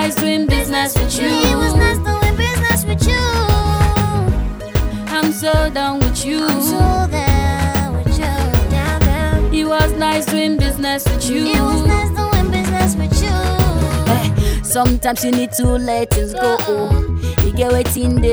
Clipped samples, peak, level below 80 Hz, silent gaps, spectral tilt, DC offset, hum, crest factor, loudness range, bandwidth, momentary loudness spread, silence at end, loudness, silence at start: under 0.1%; 0 dBFS; -20 dBFS; none; -5 dB/octave; under 0.1%; none; 14 dB; 1 LU; over 20 kHz; 3 LU; 0 s; -16 LUFS; 0 s